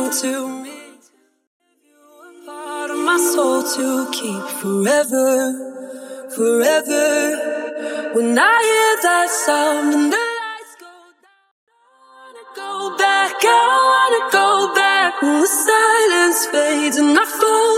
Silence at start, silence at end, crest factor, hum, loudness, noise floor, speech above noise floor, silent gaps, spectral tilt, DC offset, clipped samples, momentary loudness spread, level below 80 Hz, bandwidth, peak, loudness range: 0 s; 0 s; 16 dB; none; -16 LUFS; -56 dBFS; 40 dB; 1.47-1.60 s, 11.51-11.67 s; -2 dB/octave; under 0.1%; under 0.1%; 16 LU; -80 dBFS; 16.5 kHz; -2 dBFS; 8 LU